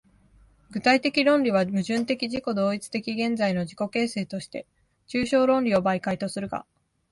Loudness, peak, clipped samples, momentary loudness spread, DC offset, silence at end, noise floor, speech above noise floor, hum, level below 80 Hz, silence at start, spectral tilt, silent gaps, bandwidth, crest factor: -25 LUFS; -6 dBFS; under 0.1%; 12 LU; under 0.1%; 0.5 s; -57 dBFS; 33 dB; none; -60 dBFS; 0.7 s; -5.5 dB/octave; none; 11.5 kHz; 18 dB